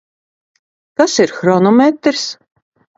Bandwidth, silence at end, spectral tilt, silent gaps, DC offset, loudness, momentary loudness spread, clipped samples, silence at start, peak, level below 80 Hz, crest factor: 8 kHz; 0.65 s; -4.5 dB/octave; none; under 0.1%; -13 LUFS; 14 LU; under 0.1%; 1 s; 0 dBFS; -60 dBFS; 16 dB